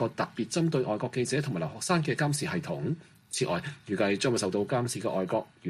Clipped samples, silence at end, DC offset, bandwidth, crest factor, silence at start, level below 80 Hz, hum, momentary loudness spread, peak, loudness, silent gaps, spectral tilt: under 0.1%; 0 s; under 0.1%; 14.5 kHz; 16 dB; 0 s; -66 dBFS; none; 6 LU; -14 dBFS; -30 LUFS; none; -5 dB/octave